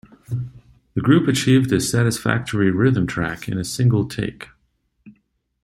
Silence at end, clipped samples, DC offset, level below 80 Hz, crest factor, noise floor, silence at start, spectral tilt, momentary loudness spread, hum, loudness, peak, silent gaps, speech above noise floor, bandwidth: 0.55 s; under 0.1%; under 0.1%; -48 dBFS; 18 dB; -67 dBFS; 0.3 s; -6 dB/octave; 13 LU; none; -20 LUFS; -2 dBFS; none; 49 dB; 15 kHz